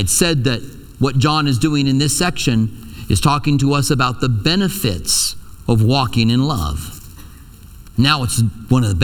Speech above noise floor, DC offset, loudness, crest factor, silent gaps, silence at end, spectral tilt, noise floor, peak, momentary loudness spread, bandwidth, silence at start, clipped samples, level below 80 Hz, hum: 23 dB; under 0.1%; -16 LUFS; 16 dB; none; 0 s; -4.5 dB/octave; -38 dBFS; 0 dBFS; 9 LU; 19 kHz; 0 s; under 0.1%; -34 dBFS; none